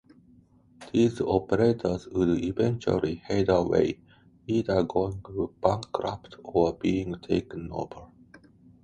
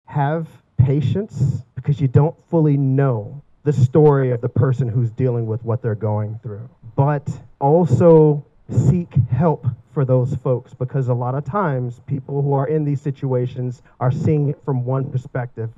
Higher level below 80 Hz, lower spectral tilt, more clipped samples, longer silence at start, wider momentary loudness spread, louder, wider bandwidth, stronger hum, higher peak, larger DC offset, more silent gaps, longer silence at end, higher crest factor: about the same, -50 dBFS vs -50 dBFS; second, -7.5 dB/octave vs -10 dB/octave; neither; first, 0.8 s vs 0.1 s; about the same, 12 LU vs 12 LU; second, -27 LUFS vs -19 LUFS; first, 10.5 kHz vs 7.6 kHz; neither; second, -6 dBFS vs -2 dBFS; neither; neither; first, 0.45 s vs 0.05 s; first, 22 dB vs 16 dB